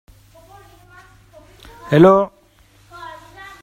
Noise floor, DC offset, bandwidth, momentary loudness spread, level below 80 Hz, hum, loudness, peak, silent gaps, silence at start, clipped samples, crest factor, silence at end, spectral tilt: -52 dBFS; under 0.1%; 14 kHz; 27 LU; -52 dBFS; none; -14 LUFS; 0 dBFS; none; 1.85 s; under 0.1%; 20 dB; 0.55 s; -8 dB/octave